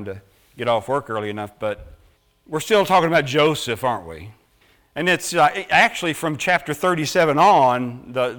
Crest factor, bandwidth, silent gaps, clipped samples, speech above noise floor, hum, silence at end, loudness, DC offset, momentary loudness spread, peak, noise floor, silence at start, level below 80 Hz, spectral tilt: 16 dB; over 20 kHz; none; under 0.1%; 38 dB; none; 0 s; -19 LUFS; under 0.1%; 14 LU; -4 dBFS; -58 dBFS; 0 s; -54 dBFS; -4 dB/octave